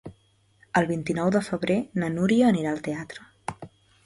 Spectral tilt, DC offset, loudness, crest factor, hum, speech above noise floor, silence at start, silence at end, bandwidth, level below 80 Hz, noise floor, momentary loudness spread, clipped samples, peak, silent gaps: -6.5 dB/octave; under 0.1%; -25 LUFS; 18 dB; none; 38 dB; 0.05 s; 0.4 s; 11.5 kHz; -60 dBFS; -63 dBFS; 17 LU; under 0.1%; -8 dBFS; none